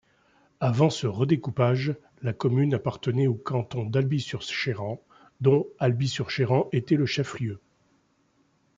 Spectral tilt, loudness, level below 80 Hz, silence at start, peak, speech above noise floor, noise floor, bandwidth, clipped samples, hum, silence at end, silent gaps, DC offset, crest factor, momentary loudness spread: -7 dB/octave; -26 LUFS; -64 dBFS; 0.6 s; -8 dBFS; 42 dB; -67 dBFS; 7.8 kHz; under 0.1%; none; 1.2 s; none; under 0.1%; 18 dB; 10 LU